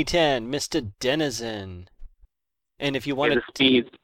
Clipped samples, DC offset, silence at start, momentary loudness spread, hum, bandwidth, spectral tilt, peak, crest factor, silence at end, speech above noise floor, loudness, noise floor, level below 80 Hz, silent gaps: under 0.1%; under 0.1%; 0 s; 14 LU; none; 16.5 kHz; -4 dB/octave; -6 dBFS; 20 dB; 0.1 s; 63 dB; -24 LUFS; -87 dBFS; -48 dBFS; none